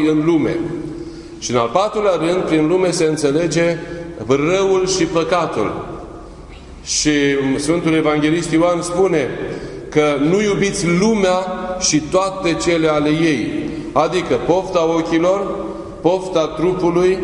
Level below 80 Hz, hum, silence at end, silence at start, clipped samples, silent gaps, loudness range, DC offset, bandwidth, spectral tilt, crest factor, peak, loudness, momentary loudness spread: -42 dBFS; none; 0 s; 0 s; under 0.1%; none; 2 LU; under 0.1%; 11 kHz; -4.5 dB/octave; 16 dB; 0 dBFS; -17 LUFS; 11 LU